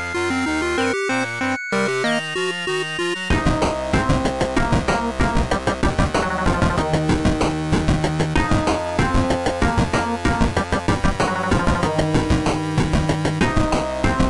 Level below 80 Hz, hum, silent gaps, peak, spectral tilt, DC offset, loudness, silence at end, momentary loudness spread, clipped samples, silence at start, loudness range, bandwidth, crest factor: -28 dBFS; none; none; -8 dBFS; -5.5 dB/octave; 0.5%; -20 LUFS; 0 s; 2 LU; under 0.1%; 0 s; 1 LU; 11.5 kHz; 12 dB